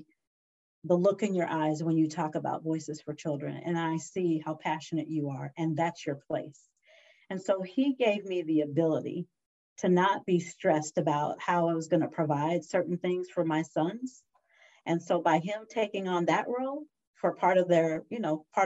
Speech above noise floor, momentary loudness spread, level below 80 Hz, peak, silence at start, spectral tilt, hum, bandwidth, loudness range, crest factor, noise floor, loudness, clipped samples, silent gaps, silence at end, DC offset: 34 dB; 10 LU; -78 dBFS; -12 dBFS; 0.85 s; -6.5 dB/octave; none; 8.2 kHz; 4 LU; 18 dB; -63 dBFS; -30 LUFS; under 0.1%; 9.46-9.76 s, 17.07-17.14 s; 0 s; under 0.1%